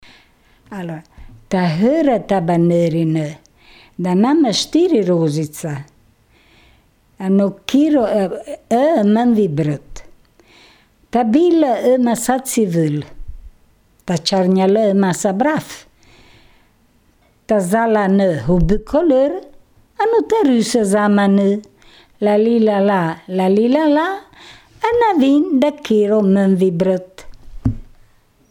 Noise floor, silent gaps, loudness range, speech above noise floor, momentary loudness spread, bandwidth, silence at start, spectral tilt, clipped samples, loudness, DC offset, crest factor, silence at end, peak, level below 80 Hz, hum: -55 dBFS; none; 3 LU; 40 dB; 12 LU; 18 kHz; 0.7 s; -6 dB/octave; under 0.1%; -16 LUFS; under 0.1%; 16 dB; 0.65 s; -2 dBFS; -38 dBFS; none